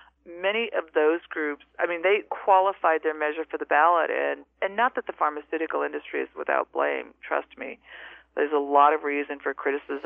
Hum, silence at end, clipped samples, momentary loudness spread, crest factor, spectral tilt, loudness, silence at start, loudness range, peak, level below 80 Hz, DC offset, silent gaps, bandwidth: none; 0.05 s; under 0.1%; 12 LU; 20 dB; -6 dB/octave; -25 LUFS; 0.25 s; 5 LU; -6 dBFS; -70 dBFS; under 0.1%; none; 3.8 kHz